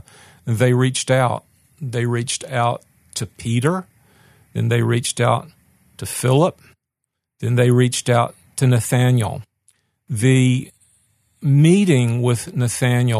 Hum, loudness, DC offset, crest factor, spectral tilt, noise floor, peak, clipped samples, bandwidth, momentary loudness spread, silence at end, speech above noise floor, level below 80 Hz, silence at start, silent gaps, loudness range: none; -18 LUFS; under 0.1%; 16 dB; -6 dB/octave; -79 dBFS; -2 dBFS; under 0.1%; 13.5 kHz; 14 LU; 0 s; 63 dB; -56 dBFS; 0.45 s; none; 4 LU